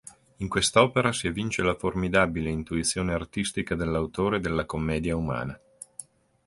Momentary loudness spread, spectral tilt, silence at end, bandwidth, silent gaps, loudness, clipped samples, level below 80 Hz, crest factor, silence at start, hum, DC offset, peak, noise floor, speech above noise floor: 15 LU; -4.5 dB/octave; 0.45 s; 11.5 kHz; none; -26 LUFS; under 0.1%; -44 dBFS; 24 dB; 0.05 s; none; under 0.1%; -4 dBFS; -48 dBFS; 22 dB